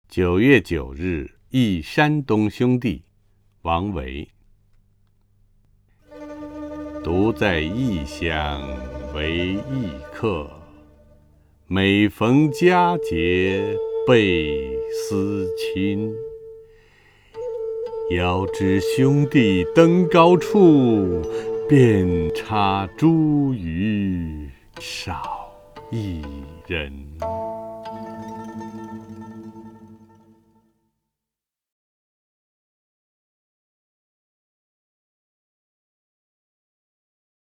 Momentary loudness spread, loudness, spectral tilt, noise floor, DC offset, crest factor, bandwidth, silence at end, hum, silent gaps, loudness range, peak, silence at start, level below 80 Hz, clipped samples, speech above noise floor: 19 LU; -20 LUFS; -7 dB/octave; -88 dBFS; under 0.1%; 22 dB; 15.5 kHz; 7.5 s; none; none; 15 LU; 0 dBFS; 0.1 s; -42 dBFS; under 0.1%; 68 dB